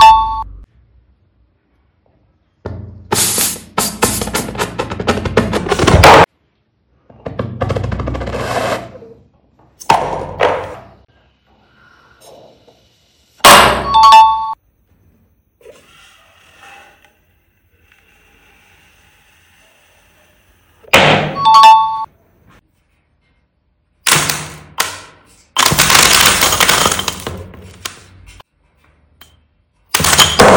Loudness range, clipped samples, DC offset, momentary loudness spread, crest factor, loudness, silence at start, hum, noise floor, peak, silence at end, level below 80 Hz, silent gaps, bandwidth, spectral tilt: 10 LU; 1%; under 0.1%; 23 LU; 14 dB; -10 LUFS; 0 s; none; -61 dBFS; 0 dBFS; 0 s; -34 dBFS; none; over 20 kHz; -2.5 dB/octave